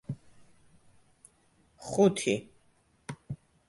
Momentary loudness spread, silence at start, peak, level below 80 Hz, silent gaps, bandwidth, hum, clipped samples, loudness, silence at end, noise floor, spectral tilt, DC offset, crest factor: 21 LU; 0.1 s; -12 dBFS; -66 dBFS; none; 11.5 kHz; none; under 0.1%; -29 LUFS; 0.35 s; -67 dBFS; -5.5 dB/octave; under 0.1%; 22 dB